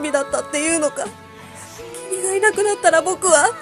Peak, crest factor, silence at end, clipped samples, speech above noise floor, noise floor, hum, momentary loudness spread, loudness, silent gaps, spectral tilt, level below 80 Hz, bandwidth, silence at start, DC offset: 0 dBFS; 18 dB; 0 s; under 0.1%; 20 dB; -38 dBFS; none; 20 LU; -18 LUFS; none; -1.5 dB/octave; -56 dBFS; 14.5 kHz; 0 s; under 0.1%